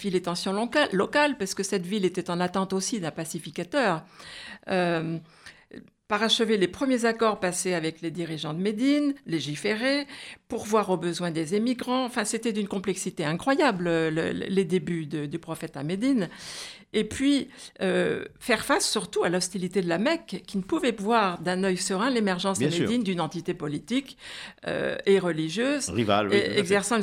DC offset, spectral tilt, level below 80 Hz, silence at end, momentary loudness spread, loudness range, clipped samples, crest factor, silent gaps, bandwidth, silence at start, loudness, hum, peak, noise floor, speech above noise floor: under 0.1%; -4.5 dB/octave; -62 dBFS; 0 s; 10 LU; 3 LU; under 0.1%; 20 dB; none; 16 kHz; 0 s; -26 LUFS; none; -8 dBFS; -49 dBFS; 22 dB